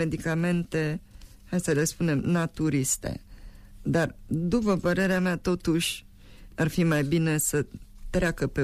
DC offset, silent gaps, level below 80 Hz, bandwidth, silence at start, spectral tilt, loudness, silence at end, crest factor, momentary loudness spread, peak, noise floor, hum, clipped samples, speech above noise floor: under 0.1%; none; -44 dBFS; 15.5 kHz; 0 s; -5 dB/octave; -27 LUFS; 0 s; 12 dB; 10 LU; -14 dBFS; -48 dBFS; none; under 0.1%; 22 dB